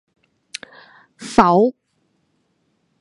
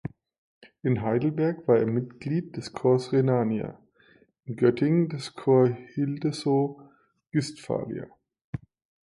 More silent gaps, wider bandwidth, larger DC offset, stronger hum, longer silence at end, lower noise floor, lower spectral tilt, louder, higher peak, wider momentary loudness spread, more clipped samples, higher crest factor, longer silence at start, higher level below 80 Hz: second, none vs 0.38-0.61 s, 8.44-8.53 s; about the same, 11.5 kHz vs 11.5 kHz; neither; neither; first, 1.3 s vs 0.55 s; first, -67 dBFS vs -60 dBFS; second, -6 dB/octave vs -7.5 dB/octave; first, -16 LUFS vs -26 LUFS; first, 0 dBFS vs -8 dBFS; first, 21 LU vs 17 LU; neither; about the same, 22 dB vs 20 dB; first, 1.2 s vs 0.05 s; first, -52 dBFS vs -62 dBFS